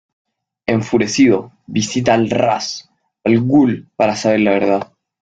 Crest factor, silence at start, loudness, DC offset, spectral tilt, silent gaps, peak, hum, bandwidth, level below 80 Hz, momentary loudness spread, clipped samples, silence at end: 14 dB; 0.7 s; -16 LUFS; under 0.1%; -5.5 dB/octave; none; -2 dBFS; none; 9 kHz; -52 dBFS; 10 LU; under 0.1%; 0.35 s